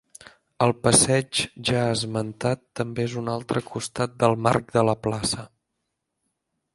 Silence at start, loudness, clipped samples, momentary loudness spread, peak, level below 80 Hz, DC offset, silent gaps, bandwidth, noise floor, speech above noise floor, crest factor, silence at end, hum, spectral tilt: 0.6 s; -23 LUFS; under 0.1%; 11 LU; -2 dBFS; -54 dBFS; under 0.1%; none; 11.5 kHz; -79 dBFS; 56 dB; 22 dB; 1.3 s; none; -4 dB/octave